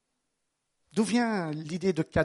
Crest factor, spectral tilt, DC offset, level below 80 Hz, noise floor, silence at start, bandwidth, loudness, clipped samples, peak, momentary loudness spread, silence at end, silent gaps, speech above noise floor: 20 dB; -6 dB/octave; under 0.1%; -54 dBFS; -80 dBFS; 0.95 s; 11.5 kHz; -29 LUFS; under 0.1%; -10 dBFS; 7 LU; 0 s; none; 53 dB